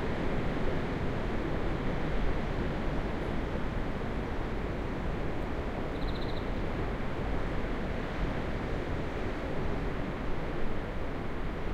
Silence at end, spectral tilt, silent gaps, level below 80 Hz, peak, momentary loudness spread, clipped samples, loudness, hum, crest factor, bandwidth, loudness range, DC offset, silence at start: 0 s; -7.5 dB/octave; none; -36 dBFS; -18 dBFS; 3 LU; under 0.1%; -35 LUFS; none; 12 dB; 8.2 kHz; 2 LU; under 0.1%; 0 s